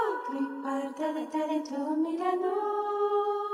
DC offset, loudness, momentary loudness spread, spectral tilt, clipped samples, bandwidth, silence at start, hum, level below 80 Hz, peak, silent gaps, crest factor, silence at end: under 0.1%; -31 LUFS; 5 LU; -4 dB/octave; under 0.1%; 12 kHz; 0 s; none; -86 dBFS; -16 dBFS; none; 14 dB; 0 s